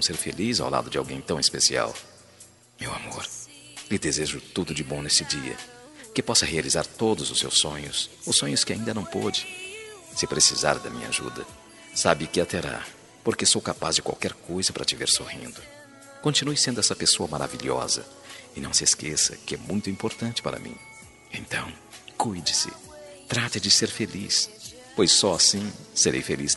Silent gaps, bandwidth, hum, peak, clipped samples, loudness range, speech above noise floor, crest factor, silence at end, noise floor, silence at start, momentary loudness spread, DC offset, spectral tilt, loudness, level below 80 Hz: none; 12 kHz; none; -2 dBFS; under 0.1%; 5 LU; 26 dB; 26 dB; 0 s; -52 dBFS; 0 s; 19 LU; under 0.1%; -2 dB/octave; -24 LUFS; -56 dBFS